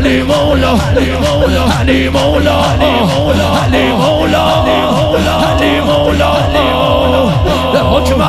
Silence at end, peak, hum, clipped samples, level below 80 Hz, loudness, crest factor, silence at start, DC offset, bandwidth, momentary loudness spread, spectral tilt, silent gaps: 0 s; 0 dBFS; none; under 0.1%; -22 dBFS; -10 LUFS; 10 dB; 0 s; under 0.1%; 15.5 kHz; 1 LU; -6 dB/octave; none